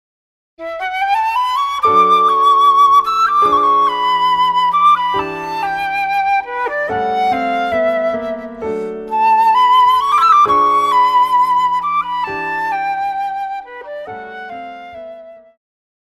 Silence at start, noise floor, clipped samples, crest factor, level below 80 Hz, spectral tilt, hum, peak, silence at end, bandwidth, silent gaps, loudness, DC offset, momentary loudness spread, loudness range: 0.6 s; -35 dBFS; under 0.1%; 14 dB; -52 dBFS; -3.5 dB/octave; none; -2 dBFS; 0.7 s; 15 kHz; none; -13 LUFS; under 0.1%; 18 LU; 9 LU